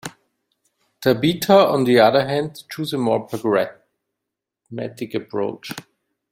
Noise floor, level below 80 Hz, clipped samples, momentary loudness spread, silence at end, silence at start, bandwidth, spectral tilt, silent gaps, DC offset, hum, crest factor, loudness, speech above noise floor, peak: -83 dBFS; -60 dBFS; under 0.1%; 18 LU; 0.5 s; 0.05 s; 16.5 kHz; -5.5 dB/octave; none; under 0.1%; none; 18 dB; -19 LUFS; 64 dB; -2 dBFS